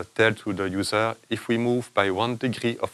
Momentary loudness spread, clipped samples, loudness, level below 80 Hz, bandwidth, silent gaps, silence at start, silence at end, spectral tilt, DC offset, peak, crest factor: 5 LU; under 0.1%; -25 LUFS; -64 dBFS; 13.5 kHz; none; 0 s; 0.05 s; -5 dB/octave; under 0.1%; -4 dBFS; 20 dB